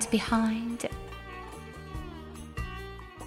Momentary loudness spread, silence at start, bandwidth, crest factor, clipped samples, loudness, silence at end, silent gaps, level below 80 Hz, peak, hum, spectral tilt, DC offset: 16 LU; 0 s; 15 kHz; 20 dB; under 0.1%; -34 LUFS; 0 s; none; -46 dBFS; -14 dBFS; none; -4.5 dB/octave; under 0.1%